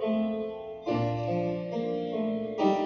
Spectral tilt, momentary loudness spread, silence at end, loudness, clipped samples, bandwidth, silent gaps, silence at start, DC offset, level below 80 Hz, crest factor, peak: -8 dB/octave; 5 LU; 0 s; -31 LUFS; under 0.1%; 6.8 kHz; none; 0 s; under 0.1%; -60 dBFS; 18 dB; -12 dBFS